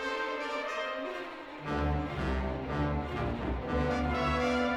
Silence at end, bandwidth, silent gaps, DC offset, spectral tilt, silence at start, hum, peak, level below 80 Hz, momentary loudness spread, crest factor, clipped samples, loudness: 0 s; 11 kHz; none; under 0.1%; -6.5 dB/octave; 0 s; none; -18 dBFS; -40 dBFS; 7 LU; 14 dB; under 0.1%; -33 LUFS